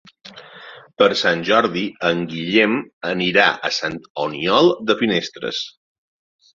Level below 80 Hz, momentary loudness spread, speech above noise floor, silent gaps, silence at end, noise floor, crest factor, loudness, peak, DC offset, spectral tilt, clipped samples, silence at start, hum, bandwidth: -60 dBFS; 12 LU; 23 dB; 2.93-3.01 s, 4.10-4.15 s; 0.9 s; -41 dBFS; 18 dB; -18 LUFS; -2 dBFS; under 0.1%; -4.5 dB/octave; under 0.1%; 0.25 s; none; 7.6 kHz